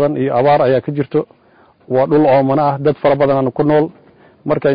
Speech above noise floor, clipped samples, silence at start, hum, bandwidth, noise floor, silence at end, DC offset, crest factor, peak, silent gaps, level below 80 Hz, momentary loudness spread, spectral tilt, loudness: 36 dB; under 0.1%; 0 s; none; 5.2 kHz; -49 dBFS; 0 s; under 0.1%; 10 dB; -4 dBFS; none; -52 dBFS; 9 LU; -13 dB/octave; -14 LUFS